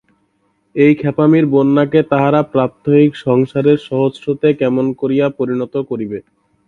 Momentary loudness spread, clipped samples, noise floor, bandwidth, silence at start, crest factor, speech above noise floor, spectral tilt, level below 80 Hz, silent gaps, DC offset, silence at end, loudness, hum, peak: 9 LU; under 0.1%; -62 dBFS; 6.4 kHz; 0.75 s; 14 dB; 48 dB; -9.5 dB/octave; -56 dBFS; none; under 0.1%; 0.5 s; -14 LUFS; none; 0 dBFS